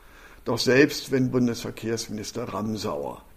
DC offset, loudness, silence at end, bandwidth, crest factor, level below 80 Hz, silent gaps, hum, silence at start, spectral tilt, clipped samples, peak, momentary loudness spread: under 0.1%; -25 LUFS; 0.15 s; 15.5 kHz; 20 dB; -52 dBFS; none; none; 0.15 s; -5 dB/octave; under 0.1%; -4 dBFS; 13 LU